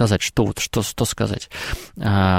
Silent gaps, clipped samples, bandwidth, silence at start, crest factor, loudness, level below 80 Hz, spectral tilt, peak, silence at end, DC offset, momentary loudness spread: none; under 0.1%; 16.5 kHz; 0 s; 16 dB; -22 LUFS; -38 dBFS; -5 dB/octave; -4 dBFS; 0 s; under 0.1%; 9 LU